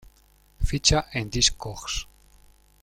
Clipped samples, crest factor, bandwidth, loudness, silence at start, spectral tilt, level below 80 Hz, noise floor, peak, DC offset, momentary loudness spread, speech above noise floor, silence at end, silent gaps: under 0.1%; 22 dB; 16 kHz; -24 LUFS; 0.6 s; -2.5 dB/octave; -34 dBFS; -59 dBFS; -4 dBFS; under 0.1%; 13 LU; 33 dB; 0.8 s; none